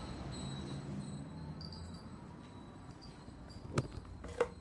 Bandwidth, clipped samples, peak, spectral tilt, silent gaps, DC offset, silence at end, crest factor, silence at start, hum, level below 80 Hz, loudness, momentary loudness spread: 11.5 kHz; under 0.1%; -16 dBFS; -6 dB/octave; none; under 0.1%; 0 s; 28 dB; 0 s; none; -56 dBFS; -46 LUFS; 12 LU